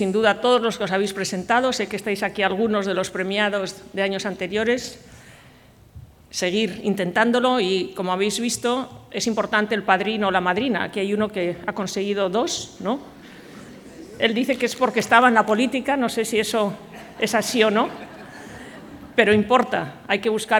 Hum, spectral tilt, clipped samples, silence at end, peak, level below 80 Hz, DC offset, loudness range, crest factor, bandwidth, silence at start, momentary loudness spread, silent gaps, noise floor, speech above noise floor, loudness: none; -4 dB/octave; under 0.1%; 0 s; -2 dBFS; -58 dBFS; under 0.1%; 6 LU; 22 dB; 18.5 kHz; 0 s; 17 LU; none; -50 dBFS; 28 dB; -21 LUFS